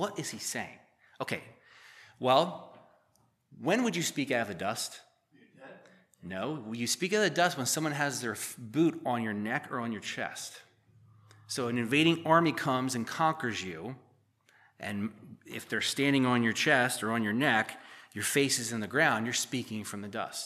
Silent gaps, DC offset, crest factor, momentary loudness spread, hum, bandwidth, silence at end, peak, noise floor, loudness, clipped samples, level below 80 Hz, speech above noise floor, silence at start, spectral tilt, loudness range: none; under 0.1%; 22 dB; 14 LU; none; 15 kHz; 0 s; -10 dBFS; -71 dBFS; -30 LUFS; under 0.1%; -80 dBFS; 40 dB; 0 s; -3.5 dB/octave; 6 LU